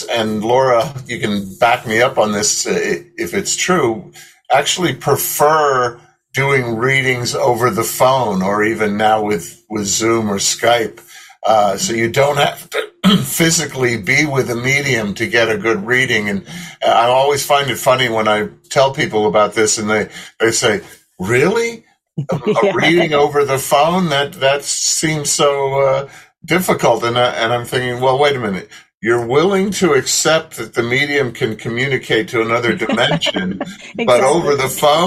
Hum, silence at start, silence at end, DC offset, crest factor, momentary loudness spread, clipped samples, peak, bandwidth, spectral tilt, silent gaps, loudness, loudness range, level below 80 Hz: none; 0 s; 0 s; under 0.1%; 14 dB; 8 LU; under 0.1%; -2 dBFS; 16 kHz; -3.5 dB/octave; 28.97-29.01 s; -15 LUFS; 2 LU; -52 dBFS